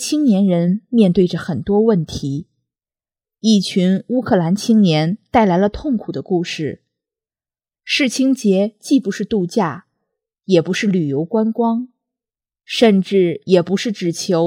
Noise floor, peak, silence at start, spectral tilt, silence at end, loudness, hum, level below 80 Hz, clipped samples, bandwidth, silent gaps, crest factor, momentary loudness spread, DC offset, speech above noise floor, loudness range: under -90 dBFS; 0 dBFS; 0 s; -6 dB/octave; 0 s; -17 LUFS; none; -48 dBFS; under 0.1%; 14.5 kHz; none; 16 dB; 9 LU; under 0.1%; over 74 dB; 3 LU